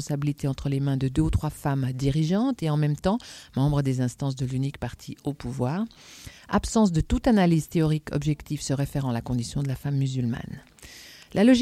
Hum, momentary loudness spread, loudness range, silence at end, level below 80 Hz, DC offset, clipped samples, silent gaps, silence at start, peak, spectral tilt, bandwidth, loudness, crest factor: none; 13 LU; 4 LU; 0 s; -40 dBFS; under 0.1%; under 0.1%; none; 0 s; -8 dBFS; -6.5 dB/octave; 14.5 kHz; -26 LUFS; 18 dB